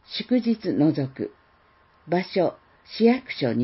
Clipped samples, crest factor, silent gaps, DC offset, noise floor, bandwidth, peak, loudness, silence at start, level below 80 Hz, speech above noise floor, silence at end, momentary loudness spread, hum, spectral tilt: under 0.1%; 18 dB; none; under 0.1%; -59 dBFS; 5.8 kHz; -6 dBFS; -24 LUFS; 0.1 s; -66 dBFS; 36 dB; 0 s; 11 LU; none; -10.5 dB/octave